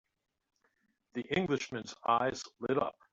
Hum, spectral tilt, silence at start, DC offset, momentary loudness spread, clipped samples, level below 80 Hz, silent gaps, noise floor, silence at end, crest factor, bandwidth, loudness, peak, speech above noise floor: none; -5 dB/octave; 1.15 s; under 0.1%; 10 LU; under 0.1%; -68 dBFS; none; -77 dBFS; 0.2 s; 22 dB; 7.8 kHz; -34 LUFS; -14 dBFS; 43 dB